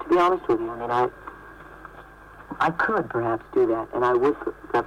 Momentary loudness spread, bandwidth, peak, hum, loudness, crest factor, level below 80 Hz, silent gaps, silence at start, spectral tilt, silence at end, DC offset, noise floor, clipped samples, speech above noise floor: 22 LU; 9.2 kHz; -14 dBFS; none; -24 LUFS; 12 dB; -52 dBFS; none; 0 s; -7 dB/octave; 0 s; under 0.1%; -46 dBFS; under 0.1%; 22 dB